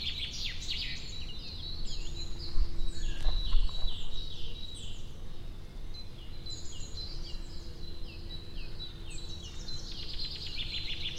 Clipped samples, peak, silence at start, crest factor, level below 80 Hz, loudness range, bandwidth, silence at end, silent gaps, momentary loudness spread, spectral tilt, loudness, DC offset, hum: under 0.1%; -12 dBFS; 0 s; 18 dB; -36 dBFS; 6 LU; 8.8 kHz; 0 s; none; 11 LU; -3 dB/octave; -40 LUFS; under 0.1%; none